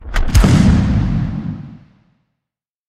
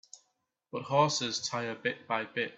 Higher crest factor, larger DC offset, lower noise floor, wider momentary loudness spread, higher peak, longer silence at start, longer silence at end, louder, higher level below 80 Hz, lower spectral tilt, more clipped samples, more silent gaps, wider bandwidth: second, 14 dB vs 22 dB; neither; first, -83 dBFS vs -79 dBFS; first, 15 LU vs 10 LU; first, 0 dBFS vs -12 dBFS; second, 0 s vs 0.15 s; first, 1.15 s vs 0 s; first, -14 LUFS vs -31 LUFS; first, -20 dBFS vs -76 dBFS; first, -6.5 dB/octave vs -3.5 dB/octave; neither; neither; first, 16 kHz vs 8.4 kHz